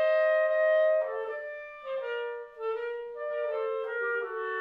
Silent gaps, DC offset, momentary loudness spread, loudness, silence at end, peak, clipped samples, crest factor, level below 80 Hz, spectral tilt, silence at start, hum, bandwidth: none; under 0.1%; 13 LU; -30 LUFS; 0 s; -16 dBFS; under 0.1%; 12 dB; -76 dBFS; -3 dB/octave; 0 s; none; 5 kHz